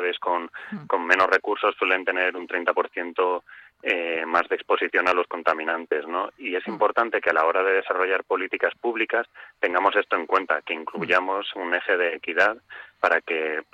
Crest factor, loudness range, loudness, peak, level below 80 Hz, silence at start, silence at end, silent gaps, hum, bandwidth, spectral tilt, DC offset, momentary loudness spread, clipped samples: 20 dB; 1 LU; -23 LUFS; -4 dBFS; -72 dBFS; 0 s; 0.1 s; none; none; 8.8 kHz; -4.5 dB/octave; under 0.1%; 8 LU; under 0.1%